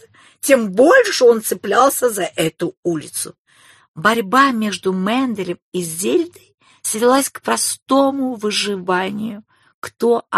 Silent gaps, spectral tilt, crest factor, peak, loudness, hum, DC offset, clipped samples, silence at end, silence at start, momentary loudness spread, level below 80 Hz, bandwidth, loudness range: 2.77-2.83 s, 3.39-3.45 s, 3.88-3.94 s, 5.62-5.72 s, 6.54-6.58 s, 7.82-7.86 s, 9.74-9.82 s; -3.5 dB/octave; 18 dB; 0 dBFS; -17 LUFS; none; under 0.1%; under 0.1%; 0 s; 0.45 s; 12 LU; -64 dBFS; 13 kHz; 4 LU